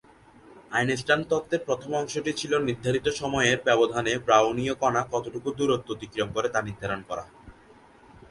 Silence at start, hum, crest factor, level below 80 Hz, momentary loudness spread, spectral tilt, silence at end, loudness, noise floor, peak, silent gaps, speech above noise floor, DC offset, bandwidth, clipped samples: 0.5 s; none; 22 dB; -56 dBFS; 10 LU; -4.5 dB/octave; 0.8 s; -26 LUFS; -54 dBFS; -6 dBFS; none; 28 dB; under 0.1%; 11.5 kHz; under 0.1%